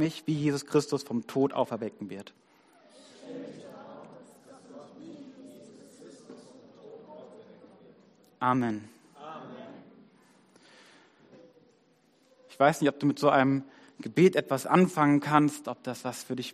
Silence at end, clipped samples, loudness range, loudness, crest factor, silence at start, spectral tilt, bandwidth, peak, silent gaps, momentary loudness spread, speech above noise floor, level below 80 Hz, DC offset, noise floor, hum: 0 s; under 0.1%; 24 LU; -27 LUFS; 24 dB; 0 s; -6 dB/octave; 14.5 kHz; -6 dBFS; none; 26 LU; 39 dB; -76 dBFS; under 0.1%; -66 dBFS; none